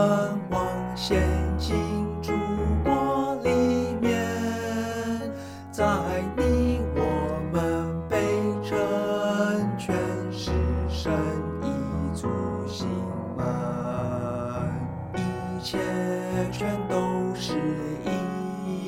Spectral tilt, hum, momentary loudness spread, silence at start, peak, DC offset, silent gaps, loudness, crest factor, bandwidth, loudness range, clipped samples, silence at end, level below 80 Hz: -6.5 dB/octave; none; 6 LU; 0 s; -10 dBFS; under 0.1%; none; -27 LUFS; 16 dB; 16 kHz; 4 LU; under 0.1%; 0 s; -38 dBFS